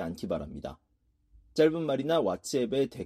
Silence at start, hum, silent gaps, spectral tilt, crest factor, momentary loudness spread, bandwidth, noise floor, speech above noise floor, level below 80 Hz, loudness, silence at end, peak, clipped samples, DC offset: 0 s; none; none; -5.5 dB/octave; 18 dB; 14 LU; 14.5 kHz; -64 dBFS; 35 dB; -56 dBFS; -29 LUFS; 0 s; -12 dBFS; under 0.1%; under 0.1%